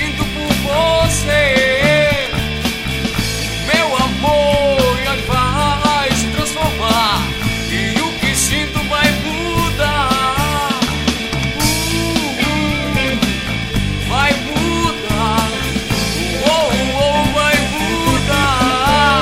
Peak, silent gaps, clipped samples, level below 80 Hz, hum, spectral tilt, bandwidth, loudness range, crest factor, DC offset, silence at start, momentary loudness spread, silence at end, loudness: 0 dBFS; none; under 0.1%; -28 dBFS; none; -4 dB/octave; 16 kHz; 2 LU; 16 dB; under 0.1%; 0 s; 5 LU; 0 s; -15 LUFS